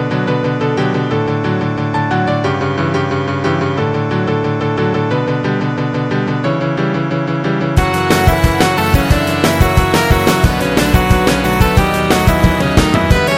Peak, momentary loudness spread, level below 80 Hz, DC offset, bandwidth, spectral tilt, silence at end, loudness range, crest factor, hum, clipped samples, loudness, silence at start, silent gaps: 0 dBFS; 5 LU; -22 dBFS; under 0.1%; 17 kHz; -6 dB/octave; 0 s; 4 LU; 14 dB; none; under 0.1%; -14 LUFS; 0 s; none